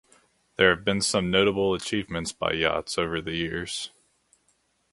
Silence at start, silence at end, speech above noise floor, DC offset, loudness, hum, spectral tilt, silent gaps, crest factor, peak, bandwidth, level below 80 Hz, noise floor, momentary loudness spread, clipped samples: 0.6 s; 1.05 s; 44 dB; under 0.1%; -25 LUFS; none; -3.5 dB/octave; none; 24 dB; -2 dBFS; 11.5 kHz; -50 dBFS; -69 dBFS; 11 LU; under 0.1%